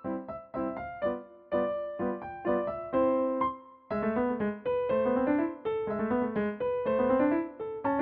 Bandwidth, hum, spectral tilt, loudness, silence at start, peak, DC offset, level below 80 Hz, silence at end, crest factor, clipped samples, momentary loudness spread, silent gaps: 4.3 kHz; none; -6.5 dB/octave; -31 LUFS; 0 s; -14 dBFS; under 0.1%; -60 dBFS; 0 s; 16 dB; under 0.1%; 9 LU; none